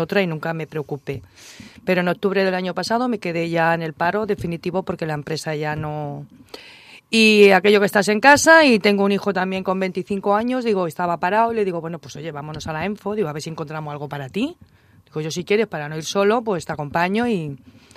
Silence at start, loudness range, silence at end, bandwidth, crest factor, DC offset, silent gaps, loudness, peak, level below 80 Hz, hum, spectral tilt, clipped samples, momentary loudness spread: 0 s; 11 LU; 0.4 s; 15.5 kHz; 20 dB; under 0.1%; none; -19 LUFS; 0 dBFS; -56 dBFS; none; -4.5 dB/octave; under 0.1%; 18 LU